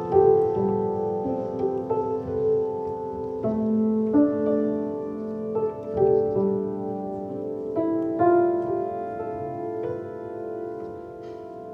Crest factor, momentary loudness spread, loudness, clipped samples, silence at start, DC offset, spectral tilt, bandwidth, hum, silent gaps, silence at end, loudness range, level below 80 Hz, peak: 18 dB; 13 LU; -25 LUFS; under 0.1%; 0 s; under 0.1%; -10.5 dB/octave; 3.8 kHz; none; none; 0 s; 3 LU; -58 dBFS; -8 dBFS